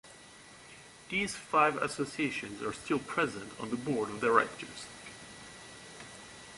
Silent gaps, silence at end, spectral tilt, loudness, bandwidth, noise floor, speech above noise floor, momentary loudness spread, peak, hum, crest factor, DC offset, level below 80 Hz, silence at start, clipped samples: none; 0 s; -4 dB/octave; -32 LUFS; 11.5 kHz; -54 dBFS; 21 dB; 23 LU; -10 dBFS; none; 24 dB; under 0.1%; -66 dBFS; 0.05 s; under 0.1%